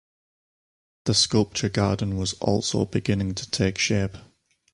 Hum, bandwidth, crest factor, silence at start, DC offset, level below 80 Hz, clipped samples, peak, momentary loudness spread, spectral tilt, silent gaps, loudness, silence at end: none; 11.5 kHz; 18 dB; 1.05 s; under 0.1%; -46 dBFS; under 0.1%; -6 dBFS; 6 LU; -4.5 dB/octave; none; -24 LUFS; 0.55 s